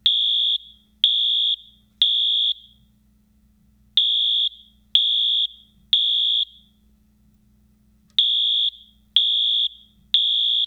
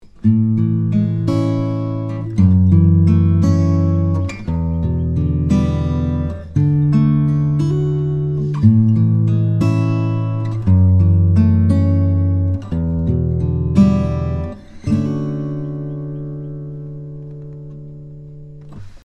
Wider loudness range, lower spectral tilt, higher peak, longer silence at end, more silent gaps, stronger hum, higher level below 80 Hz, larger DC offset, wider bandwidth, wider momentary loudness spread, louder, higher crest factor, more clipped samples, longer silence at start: second, 3 LU vs 9 LU; second, 1 dB/octave vs -10 dB/octave; about the same, -2 dBFS vs 0 dBFS; about the same, 0 s vs 0.05 s; neither; neither; second, -62 dBFS vs -36 dBFS; neither; first, 14 kHz vs 7 kHz; second, 7 LU vs 17 LU; about the same, -18 LUFS vs -16 LUFS; about the same, 20 dB vs 16 dB; neither; about the same, 0.05 s vs 0.05 s